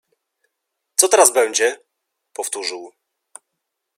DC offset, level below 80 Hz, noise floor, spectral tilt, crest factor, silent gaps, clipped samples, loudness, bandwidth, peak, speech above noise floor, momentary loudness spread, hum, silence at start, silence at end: under 0.1%; -80 dBFS; -78 dBFS; 1.5 dB/octave; 22 dB; none; under 0.1%; -17 LUFS; 16.5 kHz; 0 dBFS; 61 dB; 23 LU; none; 1 s; 1.1 s